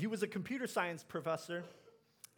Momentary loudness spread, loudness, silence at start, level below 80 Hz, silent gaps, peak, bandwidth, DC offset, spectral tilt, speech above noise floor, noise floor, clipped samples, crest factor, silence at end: 11 LU; -40 LUFS; 0 s; -86 dBFS; none; -20 dBFS; over 20 kHz; under 0.1%; -5 dB/octave; 22 dB; -62 dBFS; under 0.1%; 20 dB; 0.45 s